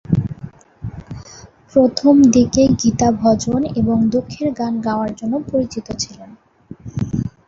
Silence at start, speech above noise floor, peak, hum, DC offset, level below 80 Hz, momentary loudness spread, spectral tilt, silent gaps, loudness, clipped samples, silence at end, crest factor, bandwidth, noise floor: 0.1 s; 26 dB; -2 dBFS; none; under 0.1%; -40 dBFS; 21 LU; -6 dB/octave; none; -17 LUFS; under 0.1%; 0.2 s; 16 dB; 7.8 kHz; -42 dBFS